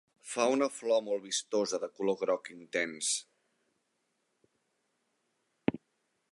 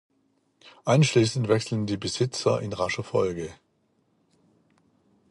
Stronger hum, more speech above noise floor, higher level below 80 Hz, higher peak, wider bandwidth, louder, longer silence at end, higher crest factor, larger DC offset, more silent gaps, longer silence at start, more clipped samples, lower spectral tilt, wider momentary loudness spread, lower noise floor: neither; about the same, 47 dB vs 45 dB; second, -74 dBFS vs -58 dBFS; second, -12 dBFS vs -8 dBFS; about the same, 11.5 kHz vs 11.5 kHz; second, -33 LUFS vs -25 LUFS; second, 0.55 s vs 1.75 s; about the same, 22 dB vs 20 dB; neither; neither; second, 0.25 s vs 0.65 s; neither; second, -2.5 dB/octave vs -5.5 dB/octave; second, 6 LU vs 9 LU; first, -80 dBFS vs -69 dBFS